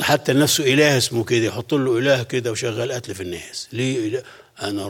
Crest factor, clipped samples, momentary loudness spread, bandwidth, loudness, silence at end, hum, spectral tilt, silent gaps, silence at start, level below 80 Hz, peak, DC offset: 18 dB; under 0.1%; 14 LU; 17.5 kHz; -20 LUFS; 0 s; none; -4 dB/octave; none; 0 s; -60 dBFS; -2 dBFS; under 0.1%